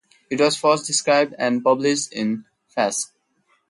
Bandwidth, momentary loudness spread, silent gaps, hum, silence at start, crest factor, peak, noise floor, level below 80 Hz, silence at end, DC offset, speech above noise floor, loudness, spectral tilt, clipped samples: 11.5 kHz; 11 LU; none; none; 0.3 s; 16 dB; -4 dBFS; -65 dBFS; -68 dBFS; 0.65 s; under 0.1%; 45 dB; -20 LUFS; -3 dB/octave; under 0.1%